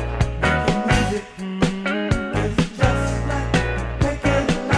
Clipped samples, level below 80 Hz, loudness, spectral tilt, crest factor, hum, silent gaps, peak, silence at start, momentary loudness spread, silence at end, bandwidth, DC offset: under 0.1%; -28 dBFS; -21 LUFS; -6 dB/octave; 18 dB; none; none; -2 dBFS; 0 s; 5 LU; 0 s; 11 kHz; under 0.1%